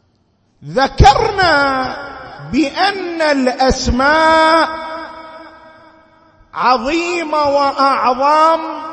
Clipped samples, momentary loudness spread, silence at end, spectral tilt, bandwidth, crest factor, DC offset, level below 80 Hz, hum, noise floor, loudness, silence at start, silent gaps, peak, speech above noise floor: under 0.1%; 18 LU; 0 s; -5 dB/octave; 9.6 kHz; 14 dB; under 0.1%; -28 dBFS; none; -58 dBFS; -13 LUFS; 0.6 s; none; 0 dBFS; 45 dB